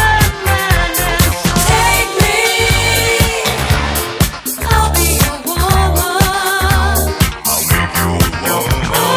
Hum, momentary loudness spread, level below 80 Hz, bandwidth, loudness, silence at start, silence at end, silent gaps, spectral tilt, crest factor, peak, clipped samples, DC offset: none; 4 LU; -20 dBFS; 16 kHz; -13 LUFS; 0 s; 0 s; none; -3.5 dB/octave; 12 dB; 0 dBFS; under 0.1%; under 0.1%